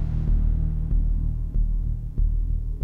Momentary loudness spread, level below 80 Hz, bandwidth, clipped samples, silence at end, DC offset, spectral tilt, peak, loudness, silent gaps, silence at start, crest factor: 4 LU; -22 dBFS; 1.5 kHz; under 0.1%; 0 s; under 0.1%; -11 dB/octave; -12 dBFS; -27 LUFS; none; 0 s; 10 dB